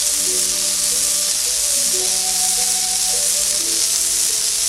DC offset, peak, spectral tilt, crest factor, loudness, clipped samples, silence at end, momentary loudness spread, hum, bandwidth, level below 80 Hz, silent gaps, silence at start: under 0.1%; 0 dBFS; 1.5 dB/octave; 18 dB; -15 LUFS; under 0.1%; 0 s; 1 LU; none; 18 kHz; -48 dBFS; none; 0 s